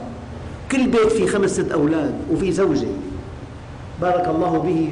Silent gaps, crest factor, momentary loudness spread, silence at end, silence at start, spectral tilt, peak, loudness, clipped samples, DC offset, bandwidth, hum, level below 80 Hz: none; 10 dB; 18 LU; 0 s; 0 s; -6 dB/octave; -10 dBFS; -20 LUFS; under 0.1%; under 0.1%; 10.5 kHz; none; -40 dBFS